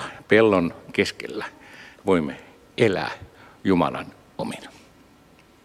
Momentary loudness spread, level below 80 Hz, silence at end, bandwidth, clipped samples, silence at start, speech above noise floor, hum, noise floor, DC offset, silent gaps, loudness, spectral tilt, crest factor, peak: 21 LU; -56 dBFS; 0.95 s; 14 kHz; under 0.1%; 0 s; 31 dB; none; -54 dBFS; under 0.1%; none; -23 LUFS; -6 dB/octave; 20 dB; -4 dBFS